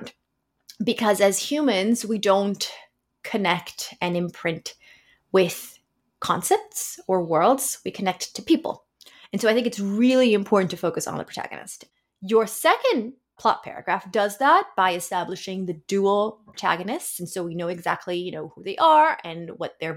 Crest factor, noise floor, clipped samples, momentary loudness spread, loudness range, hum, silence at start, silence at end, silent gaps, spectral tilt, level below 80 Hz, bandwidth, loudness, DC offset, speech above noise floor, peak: 18 dB; -75 dBFS; under 0.1%; 14 LU; 4 LU; none; 0 s; 0 s; none; -4 dB/octave; -68 dBFS; 17 kHz; -23 LUFS; under 0.1%; 52 dB; -6 dBFS